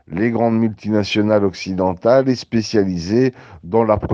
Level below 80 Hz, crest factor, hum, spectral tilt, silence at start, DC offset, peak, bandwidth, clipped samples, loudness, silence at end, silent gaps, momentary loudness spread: -48 dBFS; 16 dB; none; -7 dB/octave; 0.1 s; under 0.1%; -2 dBFS; 7.4 kHz; under 0.1%; -17 LUFS; 0 s; none; 6 LU